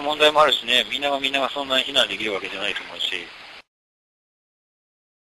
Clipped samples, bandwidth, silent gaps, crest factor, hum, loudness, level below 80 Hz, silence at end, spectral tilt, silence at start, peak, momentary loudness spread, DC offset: under 0.1%; 12.5 kHz; none; 20 dB; none; -20 LUFS; -60 dBFS; 1.65 s; -1.5 dB/octave; 0 s; -4 dBFS; 10 LU; under 0.1%